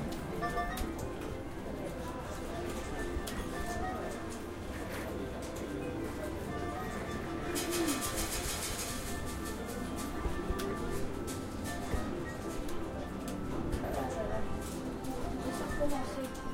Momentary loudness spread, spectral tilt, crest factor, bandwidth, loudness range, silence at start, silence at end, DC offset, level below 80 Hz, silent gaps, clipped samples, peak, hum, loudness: 6 LU; -4.5 dB/octave; 16 dB; 16 kHz; 4 LU; 0 s; 0 s; under 0.1%; -44 dBFS; none; under 0.1%; -20 dBFS; none; -38 LUFS